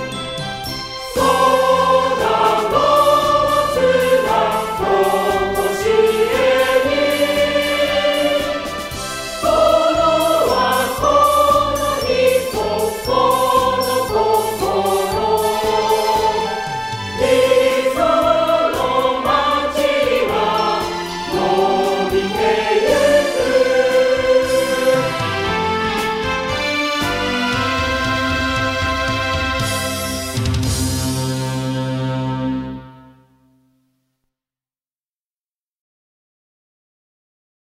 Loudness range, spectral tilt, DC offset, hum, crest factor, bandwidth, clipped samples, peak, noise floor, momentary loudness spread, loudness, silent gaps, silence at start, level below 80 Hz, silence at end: 5 LU; -4 dB/octave; under 0.1%; none; 16 dB; 16 kHz; under 0.1%; -2 dBFS; under -90 dBFS; 8 LU; -16 LUFS; none; 0 s; -38 dBFS; 4.7 s